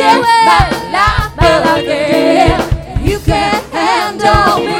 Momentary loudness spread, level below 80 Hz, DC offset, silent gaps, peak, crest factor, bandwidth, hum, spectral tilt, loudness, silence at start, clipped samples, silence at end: 7 LU; -22 dBFS; under 0.1%; none; 0 dBFS; 10 dB; 19.5 kHz; none; -5 dB/octave; -11 LUFS; 0 s; 0.4%; 0 s